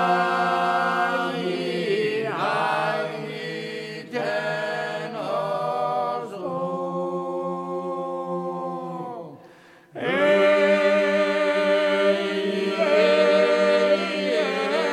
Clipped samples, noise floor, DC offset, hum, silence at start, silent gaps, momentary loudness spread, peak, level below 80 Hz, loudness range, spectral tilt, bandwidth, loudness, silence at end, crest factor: under 0.1%; -50 dBFS; under 0.1%; none; 0 s; none; 12 LU; -6 dBFS; -78 dBFS; 9 LU; -5 dB/octave; 12.5 kHz; -23 LUFS; 0 s; 18 dB